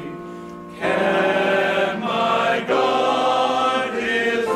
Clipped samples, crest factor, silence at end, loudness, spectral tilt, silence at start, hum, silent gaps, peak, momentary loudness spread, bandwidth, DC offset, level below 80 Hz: under 0.1%; 14 dB; 0 s; -19 LUFS; -4.5 dB/octave; 0 s; none; none; -6 dBFS; 14 LU; 14 kHz; under 0.1%; -58 dBFS